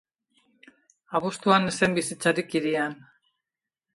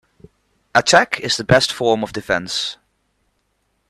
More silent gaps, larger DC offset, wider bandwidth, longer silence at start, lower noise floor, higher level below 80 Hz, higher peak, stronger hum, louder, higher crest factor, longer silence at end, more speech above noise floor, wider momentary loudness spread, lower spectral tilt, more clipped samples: neither; neither; second, 11.5 kHz vs 13.5 kHz; first, 1.1 s vs 0.75 s; first, -88 dBFS vs -68 dBFS; second, -66 dBFS vs -48 dBFS; second, -6 dBFS vs 0 dBFS; neither; second, -25 LUFS vs -17 LUFS; about the same, 22 dB vs 20 dB; second, 1 s vs 1.15 s; first, 64 dB vs 50 dB; about the same, 9 LU vs 9 LU; first, -4.5 dB/octave vs -3 dB/octave; neither